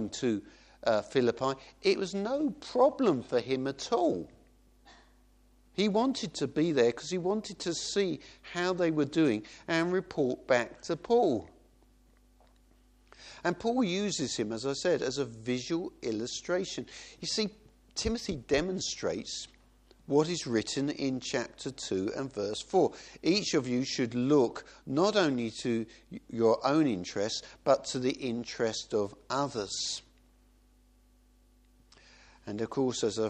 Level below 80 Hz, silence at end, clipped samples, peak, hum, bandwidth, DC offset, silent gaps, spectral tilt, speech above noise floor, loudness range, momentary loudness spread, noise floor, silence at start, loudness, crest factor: -60 dBFS; 0 s; under 0.1%; -10 dBFS; none; 10 kHz; under 0.1%; none; -4.5 dB/octave; 33 dB; 5 LU; 9 LU; -63 dBFS; 0 s; -31 LUFS; 20 dB